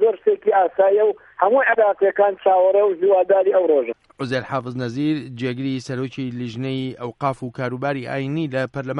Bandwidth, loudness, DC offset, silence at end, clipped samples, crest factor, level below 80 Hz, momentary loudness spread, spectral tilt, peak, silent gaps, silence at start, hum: 10 kHz; -20 LUFS; under 0.1%; 0 s; under 0.1%; 16 dB; -62 dBFS; 11 LU; -7.5 dB/octave; -2 dBFS; none; 0 s; none